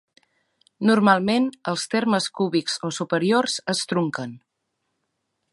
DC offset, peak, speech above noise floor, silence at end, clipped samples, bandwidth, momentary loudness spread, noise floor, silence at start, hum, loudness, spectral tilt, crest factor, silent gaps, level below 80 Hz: under 0.1%; -2 dBFS; 55 dB; 1.15 s; under 0.1%; 11.5 kHz; 9 LU; -77 dBFS; 0.8 s; none; -22 LUFS; -4.5 dB/octave; 20 dB; none; -70 dBFS